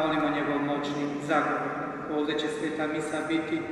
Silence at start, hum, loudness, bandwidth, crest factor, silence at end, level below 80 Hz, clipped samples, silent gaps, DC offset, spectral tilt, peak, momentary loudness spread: 0 s; none; -29 LUFS; 11.5 kHz; 16 dB; 0 s; -62 dBFS; under 0.1%; none; under 0.1%; -5.5 dB/octave; -12 dBFS; 5 LU